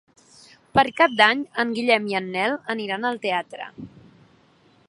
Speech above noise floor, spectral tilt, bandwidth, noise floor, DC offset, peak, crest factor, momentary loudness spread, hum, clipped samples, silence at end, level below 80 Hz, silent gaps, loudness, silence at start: 36 dB; -4.5 dB/octave; 11.5 kHz; -58 dBFS; under 0.1%; 0 dBFS; 22 dB; 16 LU; none; under 0.1%; 1 s; -60 dBFS; none; -21 LUFS; 0.75 s